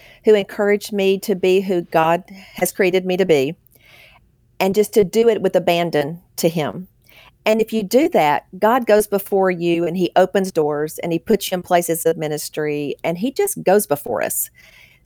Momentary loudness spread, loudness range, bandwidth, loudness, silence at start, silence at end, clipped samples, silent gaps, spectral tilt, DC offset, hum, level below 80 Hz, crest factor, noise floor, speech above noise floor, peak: 7 LU; 3 LU; over 20 kHz; -18 LUFS; 0.25 s; 0.6 s; under 0.1%; none; -4.5 dB/octave; under 0.1%; none; -56 dBFS; 16 dB; -54 dBFS; 36 dB; -4 dBFS